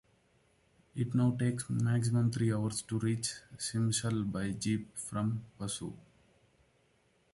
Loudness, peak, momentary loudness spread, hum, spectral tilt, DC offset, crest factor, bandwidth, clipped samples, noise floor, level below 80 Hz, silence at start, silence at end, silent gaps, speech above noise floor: -34 LUFS; -18 dBFS; 9 LU; none; -5.5 dB/octave; under 0.1%; 16 dB; 11.5 kHz; under 0.1%; -71 dBFS; -62 dBFS; 0.95 s; 1.35 s; none; 38 dB